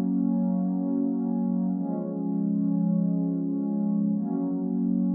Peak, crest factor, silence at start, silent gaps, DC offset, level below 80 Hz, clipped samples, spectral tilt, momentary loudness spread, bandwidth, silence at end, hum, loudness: -16 dBFS; 10 dB; 0 s; none; under 0.1%; -84 dBFS; under 0.1%; -16.5 dB/octave; 3 LU; 1.8 kHz; 0 s; none; -27 LUFS